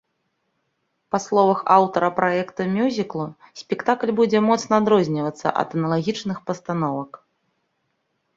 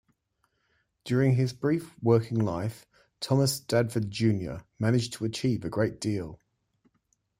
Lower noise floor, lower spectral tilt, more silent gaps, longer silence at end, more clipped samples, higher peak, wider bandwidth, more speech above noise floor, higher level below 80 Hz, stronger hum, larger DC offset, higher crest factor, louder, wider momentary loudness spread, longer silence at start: about the same, -73 dBFS vs -75 dBFS; about the same, -6 dB/octave vs -6.5 dB/octave; neither; first, 1.2 s vs 1.05 s; neither; first, -2 dBFS vs -10 dBFS; second, 7.8 kHz vs 16 kHz; first, 52 dB vs 48 dB; about the same, -64 dBFS vs -60 dBFS; neither; neither; about the same, 20 dB vs 20 dB; first, -21 LUFS vs -28 LUFS; about the same, 12 LU vs 10 LU; about the same, 1.15 s vs 1.05 s